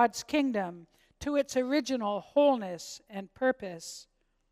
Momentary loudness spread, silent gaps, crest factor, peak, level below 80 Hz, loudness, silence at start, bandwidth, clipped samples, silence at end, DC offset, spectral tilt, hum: 16 LU; none; 20 dB; -10 dBFS; -64 dBFS; -30 LUFS; 0 s; 15 kHz; under 0.1%; 0.5 s; under 0.1%; -4 dB/octave; none